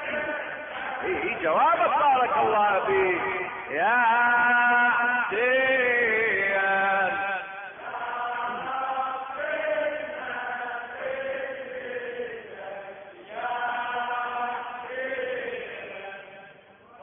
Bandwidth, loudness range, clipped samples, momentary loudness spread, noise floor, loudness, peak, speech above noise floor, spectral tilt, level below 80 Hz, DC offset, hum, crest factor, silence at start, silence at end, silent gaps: 3.8 kHz; 11 LU; under 0.1%; 16 LU; -51 dBFS; -25 LUFS; -12 dBFS; 29 dB; -7.5 dB/octave; -64 dBFS; under 0.1%; none; 14 dB; 0 s; 0 s; none